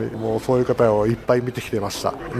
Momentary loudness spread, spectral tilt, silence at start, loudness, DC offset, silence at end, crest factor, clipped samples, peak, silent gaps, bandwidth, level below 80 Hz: 8 LU; -6.5 dB/octave; 0 s; -21 LUFS; under 0.1%; 0 s; 18 dB; under 0.1%; -4 dBFS; none; 15.5 kHz; -46 dBFS